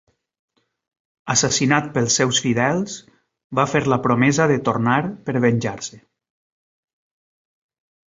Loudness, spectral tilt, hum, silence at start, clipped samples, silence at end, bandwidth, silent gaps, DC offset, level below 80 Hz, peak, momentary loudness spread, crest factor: -19 LUFS; -4 dB/octave; none; 1.25 s; under 0.1%; 2.1 s; 8 kHz; 3.44-3.50 s; under 0.1%; -56 dBFS; -2 dBFS; 11 LU; 20 dB